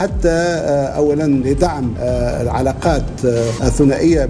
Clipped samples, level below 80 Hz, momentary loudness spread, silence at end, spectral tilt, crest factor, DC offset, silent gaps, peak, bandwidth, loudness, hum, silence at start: under 0.1%; -26 dBFS; 4 LU; 0 s; -6.5 dB/octave; 12 dB; under 0.1%; none; -2 dBFS; 11 kHz; -16 LUFS; none; 0 s